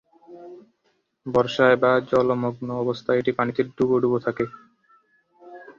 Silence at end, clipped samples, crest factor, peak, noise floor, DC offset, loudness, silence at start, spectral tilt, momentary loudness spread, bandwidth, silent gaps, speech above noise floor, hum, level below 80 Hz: 0.05 s; under 0.1%; 20 dB; -4 dBFS; -70 dBFS; under 0.1%; -22 LUFS; 0.3 s; -7 dB/octave; 12 LU; 7.2 kHz; none; 48 dB; none; -60 dBFS